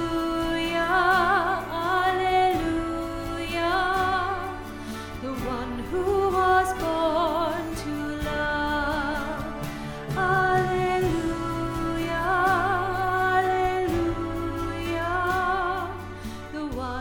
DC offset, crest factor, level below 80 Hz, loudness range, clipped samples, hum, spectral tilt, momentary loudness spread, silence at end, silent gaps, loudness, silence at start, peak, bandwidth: under 0.1%; 16 dB; -40 dBFS; 4 LU; under 0.1%; none; -5.5 dB/octave; 11 LU; 0 s; none; -25 LUFS; 0 s; -10 dBFS; 19 kHz